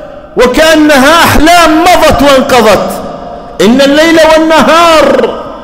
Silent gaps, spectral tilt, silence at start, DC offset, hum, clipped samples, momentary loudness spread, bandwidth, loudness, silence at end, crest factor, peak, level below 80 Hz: none; -3.5 dB/octave; 0 s; under 0.1%; none; 0.7%; 12 LU; 16.5 kHz; -4 LUFS; 0 s; 4 dB; 0 dBFS; -22 dBFS